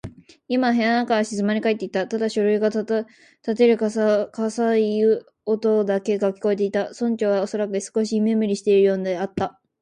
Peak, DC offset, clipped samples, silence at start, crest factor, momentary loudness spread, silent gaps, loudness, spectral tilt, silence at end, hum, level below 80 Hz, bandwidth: -6 dBFS; under 0.1%; under 0.1%; 0.05 s; 14 dB; 8 LU; none; -22 LUFS; -6 dB/octave; 0.3 s; none; -62 dBFS; 10 kHz